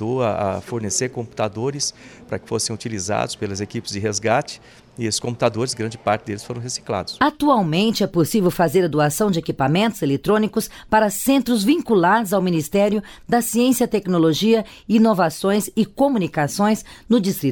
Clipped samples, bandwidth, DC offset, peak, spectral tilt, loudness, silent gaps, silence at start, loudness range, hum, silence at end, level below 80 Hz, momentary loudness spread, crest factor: under 0.1%; 19 kHz; under 0.1%; -4 dBFS; -5 dB/octave; -20 LUFS; none; 0 s; 6 LU; none; 0 s; -50 dBFS; 9 LU; 16 dB